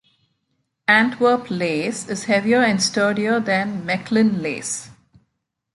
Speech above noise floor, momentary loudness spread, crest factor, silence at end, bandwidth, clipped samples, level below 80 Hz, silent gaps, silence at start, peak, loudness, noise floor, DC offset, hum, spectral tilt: 55 dB; 9 LU; 18 dB; 0.85 s; 11.5 kHz; under 0.1%; -62 dBFS; none; 0.9 s; -2 dBFS; -19 LUFS; -74 dBFS; under 0.1%; none; -4 dB/octave